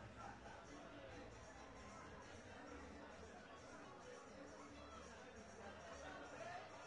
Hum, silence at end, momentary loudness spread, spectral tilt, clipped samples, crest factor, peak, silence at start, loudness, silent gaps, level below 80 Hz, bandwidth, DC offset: none; 0 s; 4 LU; -4.5 dB/octave; under 0.1%; 16 dB; -42 dBFS; 0 s; -57 LUFS; none; -72 dBFS; 10.5 kHz; under 0.1%